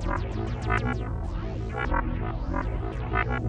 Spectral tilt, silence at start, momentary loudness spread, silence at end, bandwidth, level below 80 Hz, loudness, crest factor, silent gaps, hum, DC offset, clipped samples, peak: -7.5 dB/octave; 0 s; 5 LU; 0 s; 8.4 kHz; -32 dBFS; -30 LUFS; 16 dB; none; none; under 0.1%; under 0.1%; -12 dBFS